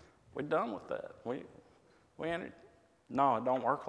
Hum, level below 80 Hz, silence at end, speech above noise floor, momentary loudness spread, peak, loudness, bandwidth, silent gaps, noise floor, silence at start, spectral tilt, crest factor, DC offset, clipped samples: none; -72 dBFS; 0 s; 31 dB; 15 LU; -16 dBFS; -36 LUFS; 10 kHz; none; -66 dBFS; 0.35 s; -7 dB/octave; 22 dB; under 0.1%; under 0.1%